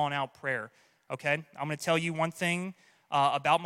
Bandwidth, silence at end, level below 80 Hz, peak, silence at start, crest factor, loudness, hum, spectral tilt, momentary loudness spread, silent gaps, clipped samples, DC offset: 16.5 kHz; 0 s; -74 dBFS; -12 dBFS; 0 s; 20 dB; -31 LUFS; none; -4.5 dB/octave; 10 LU; none; under 0.1%; under 0.1%